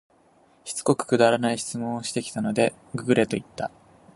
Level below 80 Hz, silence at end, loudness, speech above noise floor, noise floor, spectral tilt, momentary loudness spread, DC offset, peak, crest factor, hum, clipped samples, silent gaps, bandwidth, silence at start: -62 dBFS; 0.5 s; -25 LUFS; 35 dB; -59 dBFS; -5 dB/octave; 14 LU; under 0.1%; -4 dBFS; 20 dB; none; under 0.1%; none; 11.5 kHz; 0.65 s